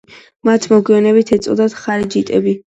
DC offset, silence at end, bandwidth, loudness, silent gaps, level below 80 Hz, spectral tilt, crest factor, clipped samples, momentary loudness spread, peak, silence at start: under 0.1%; 0.1 s; 8.4 kHz; -14 LUFS; none; -52 dBFS; -6 dB/octave; 14 dB; under 0.1%; 6 LU; 0 dBFS; 0.45 s